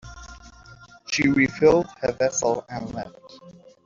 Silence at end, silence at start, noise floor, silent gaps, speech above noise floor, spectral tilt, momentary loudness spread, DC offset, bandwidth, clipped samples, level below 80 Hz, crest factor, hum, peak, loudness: 0.35 s; 0.05 s; -48 dBFS; none; 26 dB; -4.5 dB/octave; 24 LU; under 0.1%; 7.6 kHz; under 0.1%; -50 dBFS; 20 dB; none; -6 dBFS; -22 LUFS